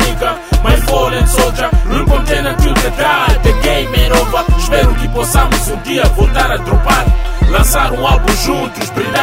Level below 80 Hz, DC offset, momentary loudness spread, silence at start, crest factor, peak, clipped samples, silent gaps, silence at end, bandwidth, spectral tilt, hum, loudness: -14 dBFS; under 0.1%; 4 LU; 0 s; 10 dB; 0 dBFS; under 0.1%; none; 0 s; 16.5 kHz; -4.5 dB/octave; none; -12 LUFS